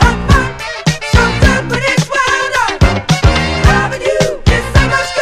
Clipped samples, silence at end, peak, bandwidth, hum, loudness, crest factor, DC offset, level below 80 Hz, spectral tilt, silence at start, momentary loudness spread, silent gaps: 0.5%; 0 s; 0 dBFS; 14.5 kHz; none; -12 LUFS; 12 dB; under 0.1%; -18 dBFS; -5 dB/octave; 0 s; 3 LU; none